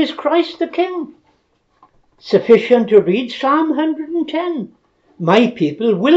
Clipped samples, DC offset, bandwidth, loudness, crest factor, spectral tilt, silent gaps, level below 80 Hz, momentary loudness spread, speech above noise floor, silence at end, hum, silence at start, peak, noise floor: under 0.1%; under 0.1%; 7.8 kHz; -16 LUFS; 16 dB; -7 dB/octave; none; -64 dBFS; 12 LU; 46 dB; 0 s; none; 0 s; 0 dBFS; -61 dBFS